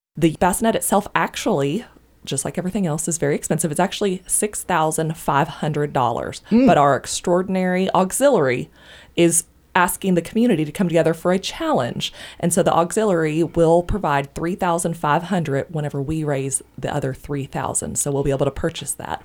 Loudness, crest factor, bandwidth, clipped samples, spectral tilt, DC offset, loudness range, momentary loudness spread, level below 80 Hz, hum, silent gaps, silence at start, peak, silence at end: -20 LUFS; 20 dB; over 20 kHz; under 0.1%; -4.5 dB/octave; under 0.1%; 4 LU; 9 LU; -44 dBFS; none; none; 0.15 s; 0 dBFS; 0.05 s